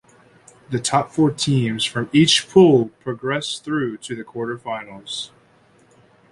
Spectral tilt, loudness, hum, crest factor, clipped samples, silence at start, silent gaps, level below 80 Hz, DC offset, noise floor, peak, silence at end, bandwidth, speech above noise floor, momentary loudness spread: -5 dB/octave; -19 LUFS; none; 18 dB; under 0.1%; 0.7 s; none; -56 dBFS; under 0.1%; -55 dBFS; -2 dBFS; 1.05 s; 11.5 kHz; 36 dB; 16 LU